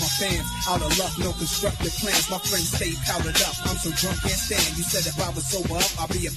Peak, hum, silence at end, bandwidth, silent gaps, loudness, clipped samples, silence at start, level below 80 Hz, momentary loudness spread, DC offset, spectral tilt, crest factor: -6 dBFS; none; 0 s; 14 kHz; none; -23 LUFS; under 0.1%; 0 s; -36 dBFS; 4 LU; under 0.1%; -2.5 dB/octave; 20 dB